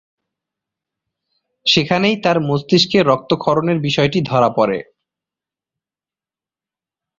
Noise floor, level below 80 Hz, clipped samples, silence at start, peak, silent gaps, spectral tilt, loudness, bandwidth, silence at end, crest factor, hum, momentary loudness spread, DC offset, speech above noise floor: under -90 dBFS; -54 dBFS; under 0.1%; 1.65 s; -2 dBFS; none; -5.5 dB/octave; -16 LUFS; 7.6 kHz; 2.35 s; 18 dB; none; 5 LU; under 0.1%; over 75 dB